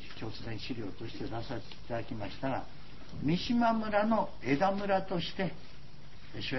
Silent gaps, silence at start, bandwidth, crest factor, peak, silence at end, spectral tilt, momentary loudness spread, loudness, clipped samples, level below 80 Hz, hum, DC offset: none; 0 s; 6 kHz; 18 dB; -16 dBFS; 0 s; -7 dB/octave; 21 LU; -34 LUFS; under 0.1%; -56 dBFS; none; 1%